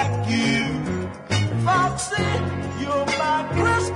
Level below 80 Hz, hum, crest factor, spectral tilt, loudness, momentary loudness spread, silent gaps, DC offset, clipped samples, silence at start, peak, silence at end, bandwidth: -46 dBFS; none; 14 dB; -5 dB/octave; -22 LUFS; 7 LU; none; under 0.1%; under 0.1%; 0 s; -8 dBFS; 0 s; 11 kHz